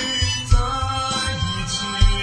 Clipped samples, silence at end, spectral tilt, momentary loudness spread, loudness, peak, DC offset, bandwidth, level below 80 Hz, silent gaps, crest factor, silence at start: under 0.1%; 0 s; -3.5 dB/octave; 3 LU; -21 LUFS; -2 dBFS; under 0.1%; 10.5 kHz; -22 dBFS; none; 18 dB; 0 s